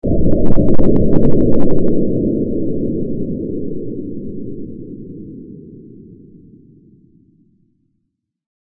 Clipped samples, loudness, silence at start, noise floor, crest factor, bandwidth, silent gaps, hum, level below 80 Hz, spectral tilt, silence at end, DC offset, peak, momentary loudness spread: under 0.1%; -18 LUFS; 0 s; -71 dBFS; 12 dB; 1.9 kHz; none; none; -26 dBFS; -13 dB/octave; 2.8 s; under 0.1%; 0 dBFS; 20 LU